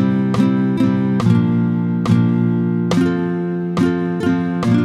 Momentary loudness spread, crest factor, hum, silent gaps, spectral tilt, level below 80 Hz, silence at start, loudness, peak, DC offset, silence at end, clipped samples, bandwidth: 4 LU; 14 dB; none; none; -8.5 dB/octave; -50 dBFS; 0 s; -17 LUFS; -2 dBFS; under 0.1%; 0 s; under 0.1%; 10.5 kHz